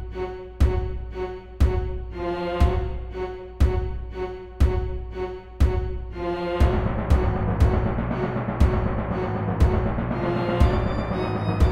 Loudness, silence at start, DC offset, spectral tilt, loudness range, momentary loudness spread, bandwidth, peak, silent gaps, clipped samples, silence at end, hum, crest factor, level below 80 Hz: -25 LUFS; 0 s; 0.6%; -8.5 dB/octave; 3 LU; 10 LU; 8.4 kHz; -4 dBFS; none; under 0.1%; 0 s; none; 18 dB; -26 dBFS